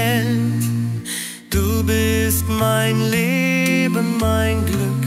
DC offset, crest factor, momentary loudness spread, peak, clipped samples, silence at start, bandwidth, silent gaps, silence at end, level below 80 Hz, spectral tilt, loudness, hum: under 0.1%; 14 dB; 6 LU; -2 dBFS; under 0.1%; 0 s; 16 kHz; none; 0 s; -34 dBFS; -5 dB/octave; -18 LUFS; none